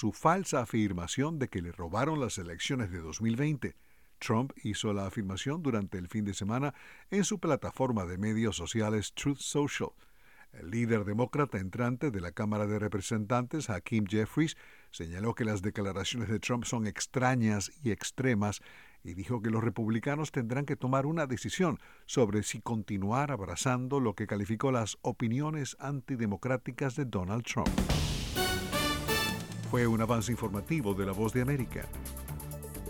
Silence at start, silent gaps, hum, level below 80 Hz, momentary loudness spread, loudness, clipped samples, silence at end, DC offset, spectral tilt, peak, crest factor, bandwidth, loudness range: 0 s; none; none; -50 dBFS; 7 LU; -33 LUFS; under 0.1%; 0 s; 0.1%; -5.5 dB/octave; -12 dBFS; 20 dB; 18 kHz; 3 LU